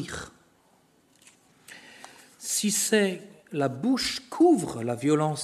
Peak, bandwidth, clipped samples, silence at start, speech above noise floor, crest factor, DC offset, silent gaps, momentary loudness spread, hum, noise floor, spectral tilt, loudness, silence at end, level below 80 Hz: -8 dBFS; 13.5 kHz; under 0.1%; 0 s; 38 dB; 20 dB; under 0.1%; none; 24 LU; none; -63 dBFS; -4 dB/octave; -25 LUFS; 0 s; -62 dBFS